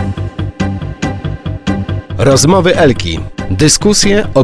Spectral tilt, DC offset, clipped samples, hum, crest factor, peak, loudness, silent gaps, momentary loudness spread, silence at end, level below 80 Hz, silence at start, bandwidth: -4.5 dB/octave; under 0.1%; 0.3%; none; 12 dB; 0 dBFS; -12 LUFS; none; 12 LU; 0 s; -28 dBFS; 0 s; 11 kHz